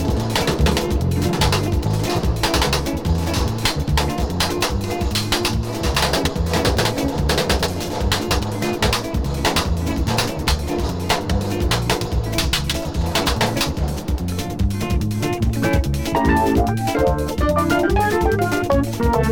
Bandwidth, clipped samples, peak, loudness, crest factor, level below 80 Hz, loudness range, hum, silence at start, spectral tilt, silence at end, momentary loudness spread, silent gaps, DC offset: over 20 kHz; under 0.1%; -6 dBFS; -20 LUFS; 14 dB; -26 dBFS; 2 LU; none; 0 s; -5 dB/octave; 0 s; 4 LU; none; 0.9%